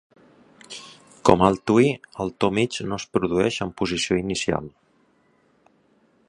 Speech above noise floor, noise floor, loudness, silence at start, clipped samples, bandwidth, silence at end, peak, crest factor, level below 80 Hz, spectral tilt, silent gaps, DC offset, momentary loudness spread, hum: 40 dB; -62 dBFS; -22 LUFS; 0.7 s; under 0.1%; 11 kHz; 1.6 s; 0 dBFS; 24 dB; -50 dBFS; -5 dB/octave; none; under 0.1%; 19 LU; none